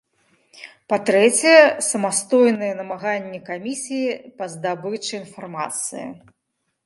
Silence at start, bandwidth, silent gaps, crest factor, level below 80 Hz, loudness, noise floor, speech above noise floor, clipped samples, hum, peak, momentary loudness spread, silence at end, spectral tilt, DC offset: 0.55 s; 12 kHz; none; 20 dB; -74 dBFS; -19 LUFS; -75 dBFS; 55 dB; under 0.1%; none; 0 dBFS; 18 LU; 0.7 s; -3 dB/octave; under 0.1%